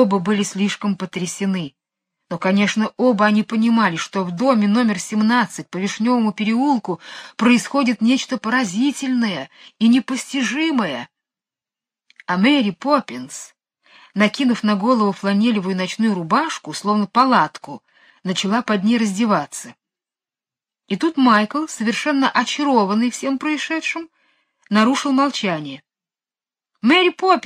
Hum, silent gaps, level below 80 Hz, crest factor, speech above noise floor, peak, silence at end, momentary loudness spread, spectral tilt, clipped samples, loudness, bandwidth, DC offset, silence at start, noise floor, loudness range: none; none; -68 dBFS; 18 dB; over 72 dB; -2 dBFS; 0.05 s; 13 LU; -4.5 dB/octave; under 0.1%; -18 LUFS; 13.5 kHz; under 0.1%; 0 s; under -90 dBFS; 3 LU